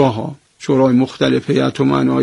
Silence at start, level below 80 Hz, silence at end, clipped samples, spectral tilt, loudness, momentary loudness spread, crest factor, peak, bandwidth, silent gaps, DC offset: 0 s; -50 dBFS; 0 s; under 0.1%; -7 dB/octave; -15 LUFS; 13 LU; 14 dB; 0 dBFS; 10.5 kHz; none; under 0.1%